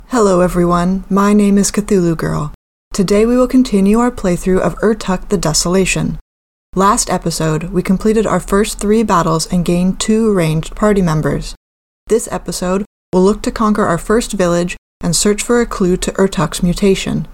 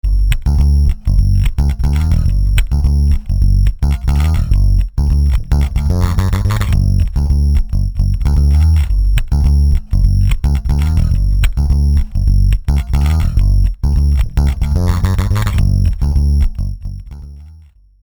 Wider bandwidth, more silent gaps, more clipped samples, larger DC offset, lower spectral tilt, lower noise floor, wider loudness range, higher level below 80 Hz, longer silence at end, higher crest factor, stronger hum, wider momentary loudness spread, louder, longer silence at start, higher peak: about the same, 16.5 kHz vs 17.5 kHz; first, 2.55-2.91 s, 6.21-6.73 s, 11.57-12.06 s, 12.86-13.12 s, 14.78-15.00 s vs none; neither; neither; second, -5.5 dB/octave vs -7 dB/octave; first, under -90 dBFS vs -41 dBFS; about the same, 3 LU vs 1 LU; second, -30 dBFS vs -12 dBFS; second, 0 s vs 0.5 s; about the same, 12 dB vs 10 dB; neither; first, 7 LU vs 3 LU; about the same, -14 LUFS vs -15 LUFS; about the same, 0 s vs 0.05 s; about the same, 0 dBFS vs 0 dBFS